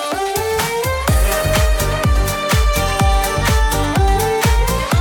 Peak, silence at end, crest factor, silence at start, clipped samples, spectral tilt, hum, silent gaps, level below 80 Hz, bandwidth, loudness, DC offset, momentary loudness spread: 0 dBFS; 0 s; 14 dB; 0 s; under 0.1%; -4.5 dB/octave; none; none; -18 dBFS; 19 kHz; -16 LUFS; under 0.1%; 3 LU